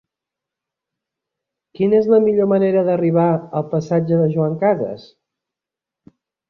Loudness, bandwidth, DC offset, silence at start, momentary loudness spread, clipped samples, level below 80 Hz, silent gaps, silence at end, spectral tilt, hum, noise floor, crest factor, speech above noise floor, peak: -17 LUFS; 6.6 kHz; under 0.1%; 1.8 s; 8 LU; under 0.1%; -62 dBFS; none; 1.5 s; -9.5 dB/octave; none; -87 dBFS; 16 dB; 71 dB; -2 dBFS